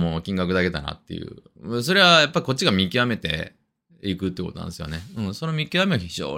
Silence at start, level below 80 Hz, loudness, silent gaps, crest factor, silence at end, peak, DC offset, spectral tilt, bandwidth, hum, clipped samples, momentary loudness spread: 0 s; -50 dBFS; -21 LUFS; none; 22 dB; 0 s; -2 dBFS; under 0.1%; -4.5 dB/octave; 16 kHz; none; under 0.1%; 18 LU